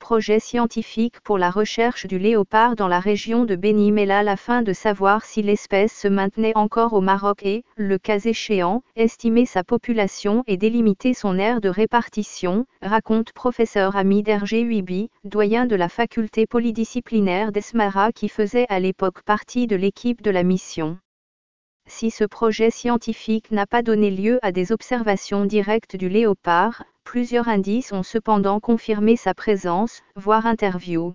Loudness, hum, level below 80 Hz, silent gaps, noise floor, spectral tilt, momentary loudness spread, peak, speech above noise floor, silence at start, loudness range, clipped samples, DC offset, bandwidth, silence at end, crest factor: -20 LUFS; none; -52 dBFS; 21.05-21.80 s; under -90 dBFS; -6 dB/octave; 6 LU; -2 dBFS; over 70 dB; 0 s; 3 LU; under 0.1%; 1%; 7.6 kHz; 0 s; 18 dB